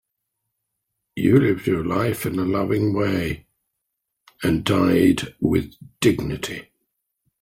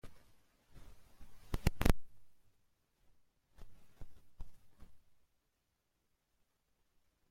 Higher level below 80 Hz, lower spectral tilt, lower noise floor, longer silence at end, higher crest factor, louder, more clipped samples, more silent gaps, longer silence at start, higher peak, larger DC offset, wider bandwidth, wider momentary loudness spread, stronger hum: about the same, -46 dBFS vs -48 dBFS; about the same, -6.5 dB/octave vs -5.5 dB/octave; second, -79 dBFS vs -83 dBFS; second, 0.8 s vs 2.3 s; second, 20 dB vs 28 dB; first, -21 LUFS vs -38 LUFS; neither; neither; first, 1.15 s vs 0.05 s; first, -4 dBFS vs -12 dBFS; neither; about the same, 16.5 kHz vs 16.5 kHz; second, 12 LU vs 28 LU; neither